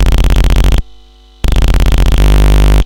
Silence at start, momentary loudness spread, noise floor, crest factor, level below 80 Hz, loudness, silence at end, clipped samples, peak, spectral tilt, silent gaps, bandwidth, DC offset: 0 s; 7 LU; -39 dBFS; 6 dB; -8 dBFS; -12 LUFS; 0 s; under 0.1%; -2 dBFS; -5.5 dB/octave; none; 17 kHz; 5%